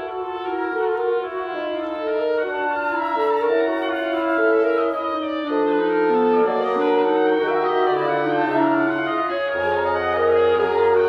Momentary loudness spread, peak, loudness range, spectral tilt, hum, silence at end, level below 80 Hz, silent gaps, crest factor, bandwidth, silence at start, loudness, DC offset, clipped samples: 7 LU; -6 dBFS; 3 LU; -7 dB/octave; none; 0 s; -60 dBFS; none; 14 dB; 5.6 kHz; 0 s; -20 LUFS; under 0.1%; under 0.1%